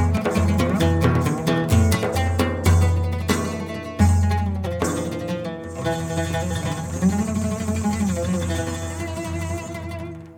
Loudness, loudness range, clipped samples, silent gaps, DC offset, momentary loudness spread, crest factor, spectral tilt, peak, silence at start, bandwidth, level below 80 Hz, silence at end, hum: -22 LUFS; 5 LU; under 0.1%; none; under 0.1%; 10 LU; 20 dB; -6 dB/octave; -2 dBFS; 0 s; 17.5 kHz; -34 dBFS; 0 s; none